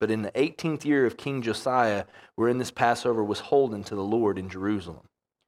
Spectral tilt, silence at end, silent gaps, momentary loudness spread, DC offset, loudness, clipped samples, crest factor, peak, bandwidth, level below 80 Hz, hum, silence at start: -6 dB/octave; 0.5 s; none; 7 LU; under 0.1%; -26 LUFS; under 0.1%; 20 dB; -6 dBFS; 14.5 kHz; -64 dBFS; none; 0 s